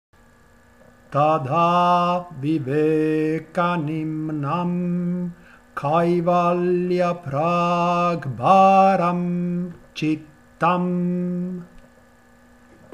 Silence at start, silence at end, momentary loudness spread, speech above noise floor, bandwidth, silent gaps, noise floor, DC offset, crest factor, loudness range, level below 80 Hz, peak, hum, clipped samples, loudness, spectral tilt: 1.1 s; 1.15 s; 10 LU; 33 dB; 9.8 kHz; none; -53 dBFS; under 0.1%; 18 dB; 5 LU; -58 dBFS; -2 dBFS; none; under 0.1%; -21 LUFS; -8 dB/octave